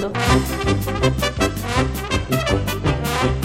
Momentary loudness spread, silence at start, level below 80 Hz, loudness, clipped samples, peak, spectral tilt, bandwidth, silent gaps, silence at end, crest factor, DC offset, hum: 3 LU; 0 s; -28 dBFS; -20 LUFS; under 0.1%; -2 dBFS; -5 dB/octave; 16.5 kHz; none; 0 s; 16 dB; under 0.1%; none